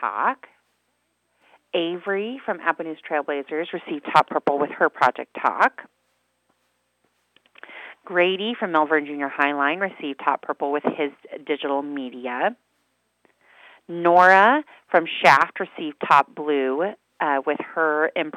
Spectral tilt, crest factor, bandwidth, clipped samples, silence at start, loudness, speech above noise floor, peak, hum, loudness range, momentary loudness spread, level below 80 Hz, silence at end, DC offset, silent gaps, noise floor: -5 dB/octave; 22 dB; 14 kHz; under 0.1%; 0 s; -22 LUFS; 50 dB; 0 dBFS; 60 Hz at -70 dBFS; 10 LU; 14 LU; -80 dBFS; 0 s; under 0.1%; none; -71 dBFS